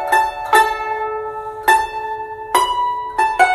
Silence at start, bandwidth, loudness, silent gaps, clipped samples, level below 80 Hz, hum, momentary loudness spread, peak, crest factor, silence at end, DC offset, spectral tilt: 0 s; 15 kHz; -18 LUFS; none; under 0.1%; -46 dBFS; none; 11 LU; 0 dBFS; 18 dB; 0 s; under 0.1%; -1.5 dB/octave